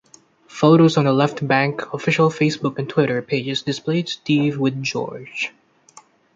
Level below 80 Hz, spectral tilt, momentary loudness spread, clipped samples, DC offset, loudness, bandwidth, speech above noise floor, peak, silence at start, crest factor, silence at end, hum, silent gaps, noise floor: -64 dBFS; -6 dB/octave; 12 LU; under 0.1%; under 0.1%; -19 LUFS; 7.8 kHz; 32 dB; -2 dBFS; 0.5 s; 18 dB; 0.85 s; none; none; -51 dBFS